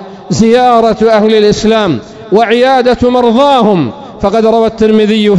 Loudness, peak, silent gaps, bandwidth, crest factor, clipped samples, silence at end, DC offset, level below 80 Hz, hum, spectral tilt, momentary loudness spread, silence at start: -8 LUFS; 0 dBFS; none; 11 kHz; 8 dB; 3%; 0 s; 0.3%; -36 dBFS; none; -6 dB/octave; 6 LU; 0 s